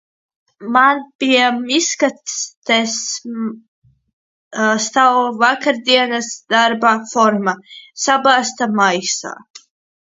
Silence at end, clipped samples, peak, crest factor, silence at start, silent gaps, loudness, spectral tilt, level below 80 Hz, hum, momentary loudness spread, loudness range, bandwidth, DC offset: 0.55 s; under 0.1%; 0 dBFS; 16 dB; 0.6 s; 1.15-1.19 s, 2.57-2.62 s, 3.68-3.82 s, 4.13-4.51 s, 9.50-9.54 s; -15 LUFS; -2 dB/octave; -66 dBFS; none; 12 LU; 4 LU; 7.8 kHz; under 0.1%